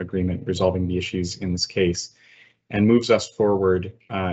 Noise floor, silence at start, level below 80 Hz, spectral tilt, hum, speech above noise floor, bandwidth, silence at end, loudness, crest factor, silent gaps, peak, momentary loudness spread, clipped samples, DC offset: -51 dBFS; 0 s; -50 dBFS; -5.5 dB/octave; none; 30 dB; 8.4 kHz; 0 s; -22 LUFS; 18 dB; none; -4 dBFS; 10 LU; under 0.1%; under 0.1%